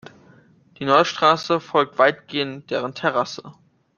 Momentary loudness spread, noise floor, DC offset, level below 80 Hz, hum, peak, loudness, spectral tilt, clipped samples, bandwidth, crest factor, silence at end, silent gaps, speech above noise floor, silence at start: 10 LU; -53 dBFS; under 0.1%; -64 dBFS; none; -2 dBFS; -20 LUFS; -4.5 dB/octave; under 0.1%; 7.2 kHz; 20 dB; 0.45 s; none; 32 dB; 0.8 s